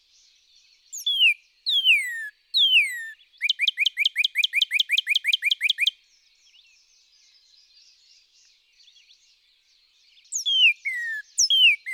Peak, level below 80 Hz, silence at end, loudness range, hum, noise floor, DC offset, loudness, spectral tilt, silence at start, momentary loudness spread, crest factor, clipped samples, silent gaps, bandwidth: -10 dBFS; -84 dBFS; 0 s; 8 LU; none; -62 dBFS; under 0.1%; -20 LUFS; 10.5 dB/octave; 0.95 s; 12 LU; 16 dB; under 0.1%; none; over 20 kHz